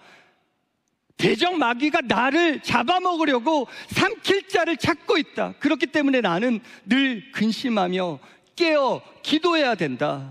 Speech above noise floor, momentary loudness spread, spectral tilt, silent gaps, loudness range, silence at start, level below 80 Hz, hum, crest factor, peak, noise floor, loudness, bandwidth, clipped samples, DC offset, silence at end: 51 dB; 5 LU; -5 dB/octave; none; 2 LU; 1.2 s; -60 dBFS; none; 20 dB; -2 dBFS; -73 dBFS; -22 LUFS; 15 kHz; under 0.1%; under 0.1%; 0 s